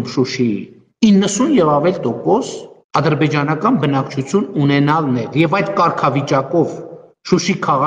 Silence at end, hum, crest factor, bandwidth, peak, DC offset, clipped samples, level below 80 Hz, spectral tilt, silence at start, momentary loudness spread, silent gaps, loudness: 0 s; none; 14 dB; 9.8 kHz; 0 dBFS; under 0.1%; under 0.1%; -54 dBFS; -6 dB/octave; 0 s; 7 LU; 2.84-2.89 s; -16 LUFS